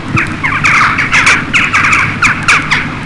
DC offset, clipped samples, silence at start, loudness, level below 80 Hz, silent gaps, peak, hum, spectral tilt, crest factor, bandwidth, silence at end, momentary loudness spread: under 0.1%; under 0.1%; 0 s; -8 LUFS; -32 dBFS; none; 0 dBFS; none; -3 dB/octave; 10 dB; 11.5 kHz; 0 s; 5 LU